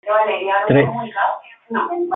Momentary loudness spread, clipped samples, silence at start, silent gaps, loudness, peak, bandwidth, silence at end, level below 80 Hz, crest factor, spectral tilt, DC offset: 9 LU; under 0.1%; 0.05 s; none; -18 LUFS; -2 dBFS; 4 kHz; 0 s; -60 dBFS; 16 dB; -10.5 dB/octave; under 0.1%